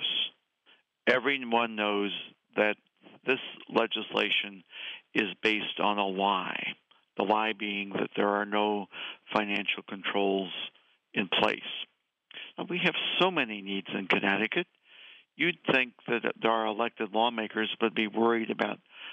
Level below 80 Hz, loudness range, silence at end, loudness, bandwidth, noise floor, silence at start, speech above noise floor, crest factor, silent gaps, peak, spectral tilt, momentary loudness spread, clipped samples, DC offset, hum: -78 dBFS; 2 LU; 0 s; -29 LUFS; 8.6 kHz; -65 dBFS; 0 s; 36 dB; 22 dB; none; -10 dBFS; -5.5 dB/octave; 12 LU; under 0.1%; under 0.1%; none